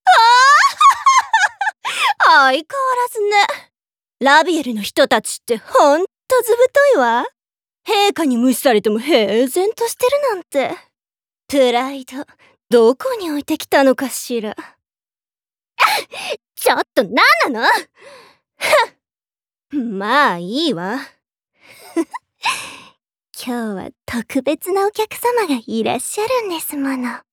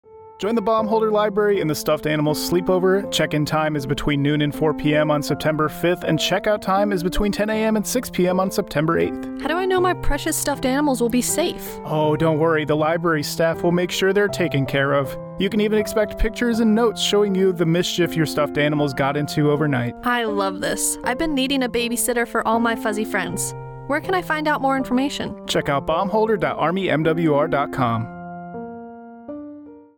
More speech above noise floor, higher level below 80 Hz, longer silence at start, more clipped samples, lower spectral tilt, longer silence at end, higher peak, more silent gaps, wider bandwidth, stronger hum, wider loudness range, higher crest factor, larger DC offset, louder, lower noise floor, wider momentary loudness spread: first, over 74 dB vs 20 dB; second, -64 dBFS vs -40 dBFS; about the same, 0.05 s vs 0.1 s; neither; second, -2.5 dB/octave vs -5 dB/octave; about the same, 0.15 s vs 0.15 s; first, -2 dBFS vs -8 dBFS; neither; about the same, over 20 kHz vs 19.5 kHz; neither; first, 7 LU vs 2 LU; about the same, 16 dB vs 12 dB; neither; first, -15 LUFS vs -20 LUFS; first, under -90 dBFS vs -40 dBFS; first, 14 LU vs 6 LU